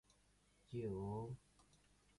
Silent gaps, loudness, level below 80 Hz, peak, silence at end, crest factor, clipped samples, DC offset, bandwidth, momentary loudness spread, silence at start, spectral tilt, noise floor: none; -49 LUFS; -70 dBFS; -34 dBFS; 0.55 s; 16 dB; under 0.1%; under 0.1%; 11.5 kHz; 8 LU; 0.7 s; -8.5 dB/octave; -75 dBFS